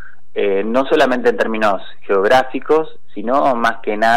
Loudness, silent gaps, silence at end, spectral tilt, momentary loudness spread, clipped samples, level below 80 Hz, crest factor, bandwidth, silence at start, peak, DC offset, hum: -16 LUFS; none; 0 s; -5 dB/octave; 9 LU; under 0.1%; -56 dBFS; 12 dB; 14.5 kHz; 0.35 s; -4 dBFS; 7%; none